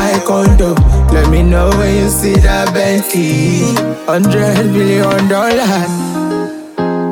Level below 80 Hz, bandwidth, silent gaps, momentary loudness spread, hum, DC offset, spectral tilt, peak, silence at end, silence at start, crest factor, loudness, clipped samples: -16 dBFS; 18 kHz; none; 7 LU; none; under 0.1%; -5.5 dB/octave; 0 dBFS; 0 s; 0 s; 10 dB; -11 LUFS; under 0.1%